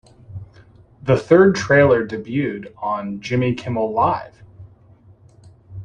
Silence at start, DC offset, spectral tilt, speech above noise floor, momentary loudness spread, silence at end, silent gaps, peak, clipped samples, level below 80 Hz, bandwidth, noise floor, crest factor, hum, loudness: 0.3 s; under 0.1%; -7 dB/octave; 32 dB; 25 LU; 0 s; none; -2 dBFS; under 0.1%; -50 dBFS; 9.4 kHz; -49 dBFS; 18 dB; none; -18 LUFS